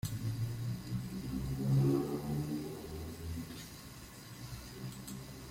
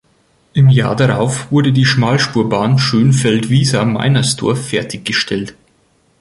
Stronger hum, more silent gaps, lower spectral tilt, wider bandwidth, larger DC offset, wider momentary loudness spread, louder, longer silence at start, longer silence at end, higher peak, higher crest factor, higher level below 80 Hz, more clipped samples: neither; neither; about the same, -6.5 dB/octave vs -5.5 dB/octave; first, 16.5 kHz vs 11.5 kHz; neither; first, 17 LU vs 8 LU; second, -39 LUFS vs -13 LUFS; second, 0.05 s vs 0.55 s; second, 0 s vs 0.7 s; second, -22 dBFS vs 0 dBFS; about the same, 16 dB vs 12 dB; second, -54 dBFS vs -46 dBFS; neither